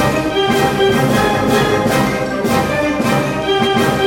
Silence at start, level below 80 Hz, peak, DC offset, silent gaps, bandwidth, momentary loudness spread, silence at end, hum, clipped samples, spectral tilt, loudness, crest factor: 0 s; -36 dBFS; 0 dBFS; under 0.1%; none; 17 kHz; 3 LU; 0 s; none; under 0.1%; -5 dB/octave; -14 LUFS; 14 dB